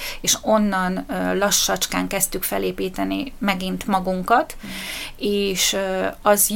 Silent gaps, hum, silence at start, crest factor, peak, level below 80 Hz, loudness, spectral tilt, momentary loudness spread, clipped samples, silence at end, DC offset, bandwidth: none; none; 0 s; 18 dB; -2 dBFS; -40 dBFS; -21 LUFS; -3 dB/octave; 8 LU; under 0.1%; 0 s; under 0.1%; 17 kHz